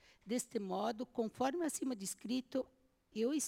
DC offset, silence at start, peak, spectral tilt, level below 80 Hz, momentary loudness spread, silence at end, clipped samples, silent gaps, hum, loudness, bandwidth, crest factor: under 0.1%; 0.25 s; -24 dBFS; -4 dB/octave; -78 dBFS; 5 LU; 0 s; under 0.1%; none; none; -40 LUFS; 16.5 kHz; 16 dB